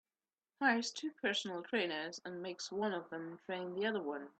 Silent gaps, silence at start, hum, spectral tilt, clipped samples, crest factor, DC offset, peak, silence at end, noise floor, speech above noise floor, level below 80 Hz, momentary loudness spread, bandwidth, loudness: none; 0.6 s; none; -3.5 dB/octave; under 0.1%; 22 dB; under 0.1%; -18 dBFS; 0.1 s; under -90 dBFS; over 51 dB; -86 dBFS; 11 LU; 8.8 kHz; -39 LUFS